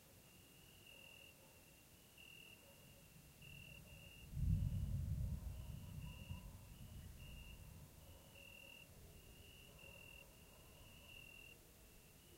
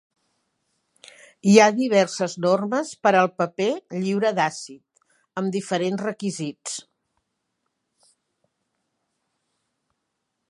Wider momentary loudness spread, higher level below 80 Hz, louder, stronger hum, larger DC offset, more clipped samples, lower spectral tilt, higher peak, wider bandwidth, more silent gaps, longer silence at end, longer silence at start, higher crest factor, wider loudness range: about the same, 18 LU vs 16 LU; first, -56 dBFS vs -74 dBFS; second, -53 LUFS vs -22 LUFS; neither; neither; neither; about the same, -5.5 dB/octave vs -5 dB/octave; second, -26 dBFS vs 0 dBFS; first, 16 kHz vs 11.5 kHz; neither; second, 0 s vs 3.7 s; second, 0 s vs 1.45 s; about the same, 24 dB vs 24 dB; about the same, 13 LU vs 15 LU